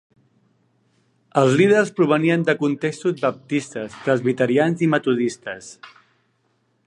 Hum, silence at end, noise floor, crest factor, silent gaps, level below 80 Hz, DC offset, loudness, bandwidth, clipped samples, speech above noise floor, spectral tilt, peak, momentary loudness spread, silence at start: none; 1 s; -66 dBFS; 18 dB; none; -68 dBFS; under 0.1%; -20 LUFS; 11 kHz; under 0.1%; 47 dB; -6.5 dB/octave; -2 dBFS; 13 LU; 1.35 s